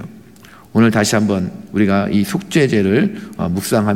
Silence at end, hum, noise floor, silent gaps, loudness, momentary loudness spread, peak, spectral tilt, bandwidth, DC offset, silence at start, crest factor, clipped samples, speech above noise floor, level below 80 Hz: 0 s; none; -42 dBFS; none; -16 LUFS; 8 LU; -2 dBFS; -5.5 dB/octave; 16.5 kHz; 0.3%; 0 s; 14 dB; under 0.1%; 27 dB; -52 dBFS